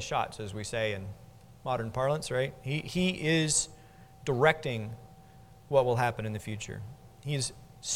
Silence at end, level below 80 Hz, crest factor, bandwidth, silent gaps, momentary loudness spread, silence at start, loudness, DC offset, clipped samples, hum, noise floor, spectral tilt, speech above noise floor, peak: 0 s; -56 dBFS; 24 dB; 17 kHz; none; 17 LU; 0 s; -31 LUFS; under 0.1%; under 0.1%; none; -54 dBFS; -4 dB/octave; 24 dB; -8 dBFS